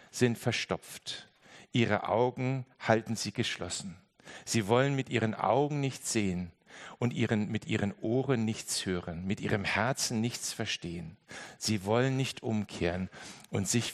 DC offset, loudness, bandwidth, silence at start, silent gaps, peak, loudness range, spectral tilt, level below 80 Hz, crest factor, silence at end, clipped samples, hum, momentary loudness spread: under 0.1%; -32 LUFS; 13 kHz; 0.15 s; none; -8 dBFS; 2 LU; -4.5 dB/octave; -66 dBFS; 24 dB; 0 s; under 0.1%; none; 13 LU